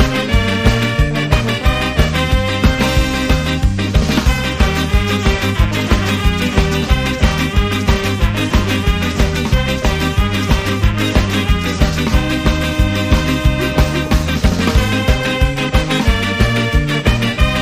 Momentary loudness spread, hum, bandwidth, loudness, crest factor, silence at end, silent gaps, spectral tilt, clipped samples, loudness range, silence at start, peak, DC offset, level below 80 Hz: 2 LU; none; 15.5 kHz; -15 LUFS; 14 dB; 0 s; none; -5.5 dB/octave; under 0.1%; 1 LU; 0 s; 0 dBFS; under 0.1%; -18 dBFS